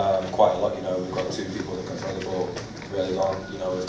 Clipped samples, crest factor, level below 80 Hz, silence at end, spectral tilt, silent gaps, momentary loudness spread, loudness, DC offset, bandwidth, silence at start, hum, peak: under 0.1%; 20 dB; -50 dBFS; 0 s; -5.5 dB/octave; none; 10 LU; -27 LUFS; under 0.1%; 8 kHz; 0 s; none; -4 dBFS